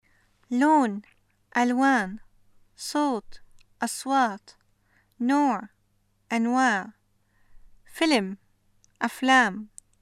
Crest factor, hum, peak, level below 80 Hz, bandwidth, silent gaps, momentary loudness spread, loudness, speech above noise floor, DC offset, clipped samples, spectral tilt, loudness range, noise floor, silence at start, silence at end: 20 dB; none; -6 dBFS; -62 dBFS; 15 kHz; none; 19 LU; -25 LUFS; 44 dB; under 0.1%; under 0.1%; -3.5 dB/octave; 3 LU; -68 dBFS; 0.5 s; 0.35 s